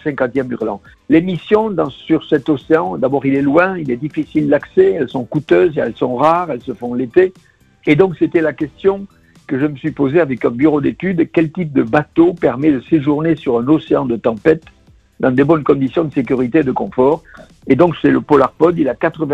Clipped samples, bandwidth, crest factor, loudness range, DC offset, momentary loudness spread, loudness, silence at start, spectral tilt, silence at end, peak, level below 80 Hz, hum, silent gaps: under 0.1%; 7.8 kHz; 14 dB; 2 LU; under 0.1%; 7 LU; -15 LUFS; 0.05 s; -9 dB/octave; 0 s; 0 dBFS; -48 dBFS; none; none